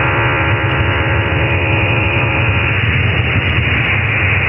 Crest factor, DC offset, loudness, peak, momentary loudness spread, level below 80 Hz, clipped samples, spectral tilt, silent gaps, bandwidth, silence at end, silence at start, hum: 10 dB; under 0.1%; -13 LUFS; -4 dBFS; 1 LU; -26 dBFS; under 0.1%; -9.5 dB/octave; none; 5.4 kHz; 0 s; 0 s; none